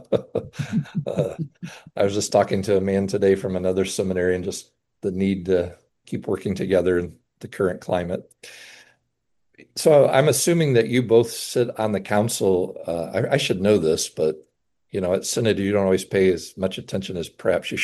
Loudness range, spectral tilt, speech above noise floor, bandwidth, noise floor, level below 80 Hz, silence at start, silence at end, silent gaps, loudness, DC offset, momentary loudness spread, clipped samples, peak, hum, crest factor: 5 LU; -5 dB/octave; 53 dB; 12.5 kHz; -74 dBFS; -60 dBFS; 0.1 s; 0 s; none; -22 LUFS; under 0.1%; 14 LU; under 0.1%; -4 dBFS; none; 18 dB